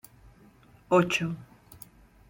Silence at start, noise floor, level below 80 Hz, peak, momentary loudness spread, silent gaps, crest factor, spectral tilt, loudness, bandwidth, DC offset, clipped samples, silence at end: 0.9 s; -57 dBFS; -60 dBFS; -10 dBFS; 25 LU; none; 22 dB; -5.5 dB/octave; -26 LUFS; 16.5 kHz; under 0.1%; under 0.1%; 0.85 s